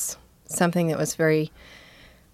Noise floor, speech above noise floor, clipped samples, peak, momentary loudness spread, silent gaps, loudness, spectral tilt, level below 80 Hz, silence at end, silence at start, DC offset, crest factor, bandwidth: -51 dBFS; 28 dB; under 0.1%; -6 dBFS; 11 LU; none; -24 LUFS; -5 dB/octave; -58 dBFS; 0.55 s; 0 s; under 0.1%; 20 dB; 16 kHz